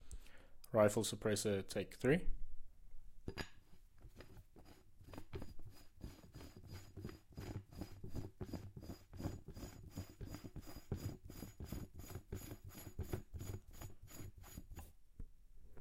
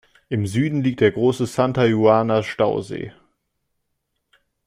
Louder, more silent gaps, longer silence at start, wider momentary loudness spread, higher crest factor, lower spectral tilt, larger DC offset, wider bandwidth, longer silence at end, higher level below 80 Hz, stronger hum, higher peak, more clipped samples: second, -45 LUFS vs -19 LUFS; neither; second, 0 s vs 0.3 s; first, 23 LU vs 12 LU; first, 24 dB vs 18 dB; second, -5 dB/octave vs -7 dB/octave; neither; first, 16.5 kHz vs 14.5 kHz; second, 0 s vs 1.55 s; about the same, -56 dBFS vs -56 dBFS; neither; second, -20 dBFS vs -2 dBFS; neither